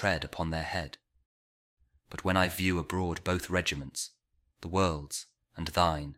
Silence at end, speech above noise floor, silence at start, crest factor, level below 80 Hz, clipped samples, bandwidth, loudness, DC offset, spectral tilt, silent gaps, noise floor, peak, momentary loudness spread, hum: 0 s; over 59 dB; 0 s; 22 dB; -50 dBFS; under 0.1%; 16 kHz; -32 LUFS; under 0.1%; -4.5 dB/octave; 1.26-1.77 s; under -90 dBFS; -10 dBFS; 14 LU; none